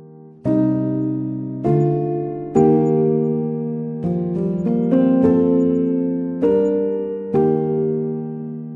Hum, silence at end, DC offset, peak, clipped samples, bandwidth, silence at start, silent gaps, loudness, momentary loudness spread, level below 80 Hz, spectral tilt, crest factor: none; 0 s; under 0.1%; -2 dBFS; under 0.1%; 7.4 kHz; 0 s; none; -19 LUFS; 9 LU; -54 dBFS; -11 dB/octave; 16 dB